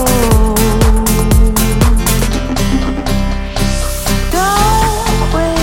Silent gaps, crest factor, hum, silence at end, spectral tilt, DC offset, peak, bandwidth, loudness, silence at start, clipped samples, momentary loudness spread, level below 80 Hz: none; 10 dB; none; 0 s; -4.5 dB/octave; under 0.1%; 0 dBFS; 17 kHz; -13 LUFS; 0 s; under 0.1%; 5 LU; -14 dBFS